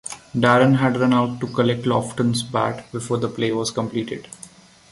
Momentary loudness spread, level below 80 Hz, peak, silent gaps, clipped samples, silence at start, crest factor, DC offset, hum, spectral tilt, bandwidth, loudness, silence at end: 14 LU; -56 dBFS; -2 dBFS; none; under 0.1%; 0.05 s; 18 dB; under 0.1%; none; -5.5 dB/octave; 11.5 kHz; -20 LUFS; 0.45 s